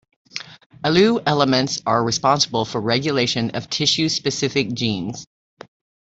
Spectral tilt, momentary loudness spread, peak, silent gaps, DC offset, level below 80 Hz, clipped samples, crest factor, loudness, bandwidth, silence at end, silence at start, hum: -4 dB/octave; 14 LU; -2 dBFS; 0.66-0.70 s; under 0.1%; -56 dBFS; under 0.1%; 18 dB; -19 LUFS; 8.2 kHz; 0.85 s; 0.35 s; none